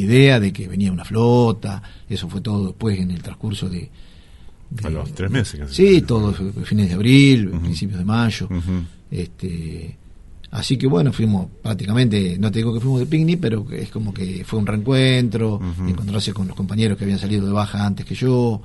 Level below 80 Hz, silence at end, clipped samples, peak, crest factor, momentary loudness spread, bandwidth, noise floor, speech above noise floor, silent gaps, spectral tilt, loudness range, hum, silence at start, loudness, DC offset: -38 dBFS; 0 s; under 0.1%; 0 dBFS; 18 dB; 14 LU; 11.5 kHz; -41 dBFS; 22 dB; none; -7 dB/octave; 8 LU; none; 0 s; -19 LUFS; under 0.1%